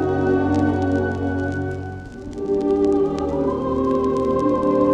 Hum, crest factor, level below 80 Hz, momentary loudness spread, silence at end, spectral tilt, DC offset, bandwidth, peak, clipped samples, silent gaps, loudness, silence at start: none; 14 dB; -42 dBFS; 10 LU; 0 s; -8.5 dB/octave; under 0.1%; 8.8 kHz; -6 dBFS; under 0.1%; none; -21 LUFS; 0 s